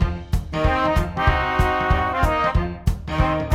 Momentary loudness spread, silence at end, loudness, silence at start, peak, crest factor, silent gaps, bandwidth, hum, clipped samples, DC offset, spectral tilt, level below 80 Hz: 6 LU; 0 s; -21 LUFS; 0 s; -4 dBFS; 16 dB; none; 15.5 kHz; none; under 0.1%; under 0.1%; -6.5 dB/octave; -26 dBFS